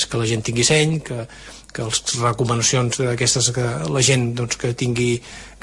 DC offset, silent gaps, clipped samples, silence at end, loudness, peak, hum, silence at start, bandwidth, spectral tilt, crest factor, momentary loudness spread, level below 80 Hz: under 0.1%; none; under 0.1%; 0.1 s; -19 LUFS; -4 dBFS; none; 0 s; 11.5 kHz; -3.5 dB/octave; 16 dB; 14 LU; -46 dBFS